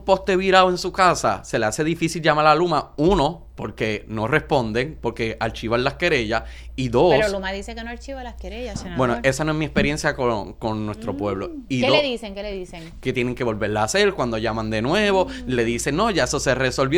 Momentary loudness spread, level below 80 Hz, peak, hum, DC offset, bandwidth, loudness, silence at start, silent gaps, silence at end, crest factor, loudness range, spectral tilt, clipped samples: 14 LU; -38 dBFS; -2 dBFS; none; under 0.1%; 19 kHz; -21 LUFS; 0 s; none; 0 s; 20 dB; 4 LU; -4.5 dB/octave; under 0.1%